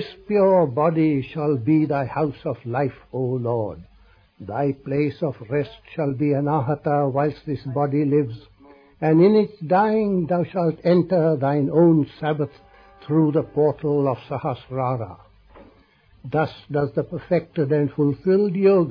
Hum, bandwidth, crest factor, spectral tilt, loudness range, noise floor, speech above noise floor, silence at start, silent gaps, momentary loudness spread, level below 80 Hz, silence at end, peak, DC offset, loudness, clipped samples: none; 5.2 kHz; 16 dB; -11 dB/octave; 6 LU; -55 dBFS; 34 dB; 0 s; none; 10 LU; -56 dBFS; 0 s; -6 dBFS; under 0.1%; -21 LUFS; under 0.1%